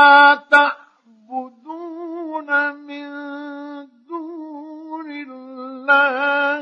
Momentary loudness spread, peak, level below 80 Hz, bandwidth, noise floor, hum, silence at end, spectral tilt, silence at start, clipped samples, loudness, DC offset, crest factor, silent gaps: 21 LU; 0 dBFS; -80 dBFS; 9.4 kHz; -51 dBFS; none; 0 s; -2 dB/octave; 0 s; under 0.1%; -15 LUFS; under 0.1%; 18 dB; none